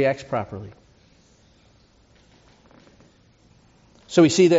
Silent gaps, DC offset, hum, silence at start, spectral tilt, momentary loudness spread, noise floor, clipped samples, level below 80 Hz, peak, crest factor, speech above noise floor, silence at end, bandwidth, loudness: none; under 0.1%; none; 0 s; -5.5 dB/octave; 22 LU; -57 dBFS; under 0.1%; -60 dBFS; -4 dBFS; 20 dB; 38 dB; 0 s; 8 kHz; -21 LUFS